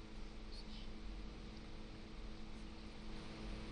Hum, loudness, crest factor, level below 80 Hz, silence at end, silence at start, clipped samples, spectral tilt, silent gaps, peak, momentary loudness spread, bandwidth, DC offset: none; -54 LUFS; 12 dB; -52 dBFS; 0 s; 0 s; under 0.1%; -5.5 dB/octave; none; -38 dBFS; 4 LU; 10 kHz; under 0.1%